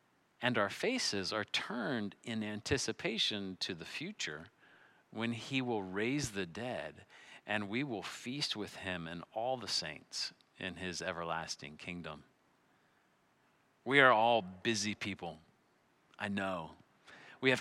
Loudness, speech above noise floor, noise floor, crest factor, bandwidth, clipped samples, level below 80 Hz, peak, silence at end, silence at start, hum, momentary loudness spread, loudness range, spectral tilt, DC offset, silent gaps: -36 LUFS; 36 dB; -72 dBFS; 28 dB; 15 kHz; under 0.1%; -72 dBFS; -10 dBFS; 0 s; 0.4 s; none; 12 LU; 7 LU; -3.5 dB/octave; under 0.1%; none